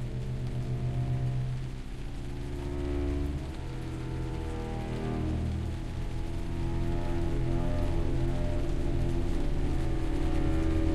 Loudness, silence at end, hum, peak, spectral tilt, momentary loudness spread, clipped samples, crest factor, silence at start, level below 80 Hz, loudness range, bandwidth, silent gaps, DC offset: -34 LUFS; 0 s; none; -16 dBFS; -7.5 dB/octave; 6 LU; under 0.1%; 14 dB; 0 s; -32 dBFS; 3 LU; 11.5 kHz; none; under 0.1%